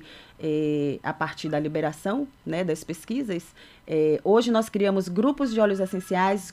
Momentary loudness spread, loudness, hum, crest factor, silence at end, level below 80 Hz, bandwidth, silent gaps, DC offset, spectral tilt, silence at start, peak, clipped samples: 9 LU; -25 LUFS; none; 16 dB; 0 s; -60 dBFS; 15.5 kHz; none; under 0.1%; -6 dB/octave; 0 s; -8 dBFS; under 0.1%